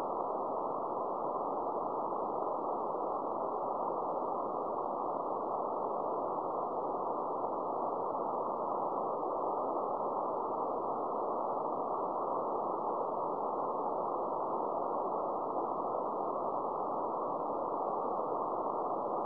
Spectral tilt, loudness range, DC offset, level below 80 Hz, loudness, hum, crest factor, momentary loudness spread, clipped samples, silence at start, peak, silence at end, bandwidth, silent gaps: -9 dB/octave; 1 LU; under 0.1%; -74 dBFS; -36 LUFS; none; 14 dB; 1 LU; under 0.1%; 0 s; -22 dBFS; 0 s; 5.4 kHz; none